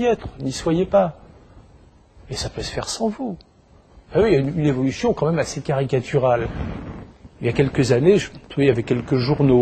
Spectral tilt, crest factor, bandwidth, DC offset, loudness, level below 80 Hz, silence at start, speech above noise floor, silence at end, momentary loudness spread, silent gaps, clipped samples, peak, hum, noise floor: -6.5 dB/octave; 18 dB; 9 kHz; under 0.1%; -21 LUFS; -42 dBFS; 0 s; 30 dB; 0 s; 13 LU; none; under 0.1%; -2 dBFS; none; -50 dBFS